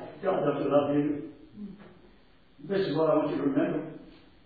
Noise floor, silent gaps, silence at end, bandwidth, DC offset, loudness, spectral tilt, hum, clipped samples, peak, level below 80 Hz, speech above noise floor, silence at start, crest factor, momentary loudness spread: -60 dBFS; none; 0.3 s; 4.9 kHz; under 0.1%; -28 LUFS; -10 dB/octave; none; under 0.1%; -10 dBFS; -64 dBFS; 32 dB; 0 s; 18 dB; 20 LU